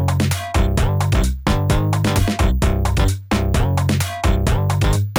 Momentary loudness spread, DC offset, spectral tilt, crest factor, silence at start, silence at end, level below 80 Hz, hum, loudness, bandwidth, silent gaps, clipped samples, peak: 2 LU; under 0.1%; -5.5 dB/octave; 12 dB; 0 s; 0 s; -22 dBFS; none; -19 LUFS; 17.5 kHz; none; under 0.1%; -4 dBFS